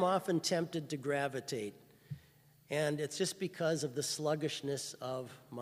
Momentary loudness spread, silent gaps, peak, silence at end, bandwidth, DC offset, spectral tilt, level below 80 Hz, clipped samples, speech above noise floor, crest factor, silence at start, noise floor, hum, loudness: 13 LU; none; -18 dBFS; 0 s; 15.5 kHz; under 0.1%; -4 dB/octave; -78 dBFS; under 0.1%; 29 dB; 18 dB; 0 s; -65 dBFS; none; -37 LUFS